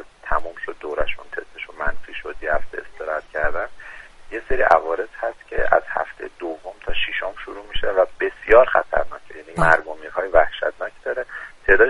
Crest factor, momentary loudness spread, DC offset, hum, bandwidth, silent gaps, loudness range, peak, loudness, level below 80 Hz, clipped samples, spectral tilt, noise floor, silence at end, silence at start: 20 dB; 16 LU; under 0.1%; none; 11 kHz; none; 8 LU; 0 dBFS; -22 LUFS; -36 dBFS; under 0.1%; -5 dB/octave; -39 dBFS; 0 s; 0 s